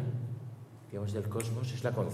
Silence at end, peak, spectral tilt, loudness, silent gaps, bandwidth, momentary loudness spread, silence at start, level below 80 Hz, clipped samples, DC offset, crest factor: 0 s; -18 dBFS; -6.5 dB/octave; -37 LUFS; none; 14.5 kHz; 11 LU; 0 s; -74 dBFS; under 0.1%; under 0.1%; 16 dB